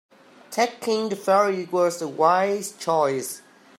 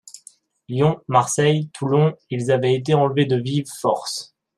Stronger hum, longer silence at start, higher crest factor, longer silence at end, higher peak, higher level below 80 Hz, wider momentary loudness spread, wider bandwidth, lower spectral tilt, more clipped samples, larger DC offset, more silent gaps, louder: neither; first, 0.5 s vs 0.15 s; about the same, 18 dB vs 18 dB; about the same, 0.4 s vs 0.3 s; second, -6 dBFS vs -2 dBFS; second, -78 dBFS vs -60 dBFS; about the same, 9 LU vs 8 LU; first, 16 kHz vs 13.5 kHz; second, -4 dB/octave vs -5.5 dB/octave; neither; neither; neither; second, -23 LUFS vs -20 LUFS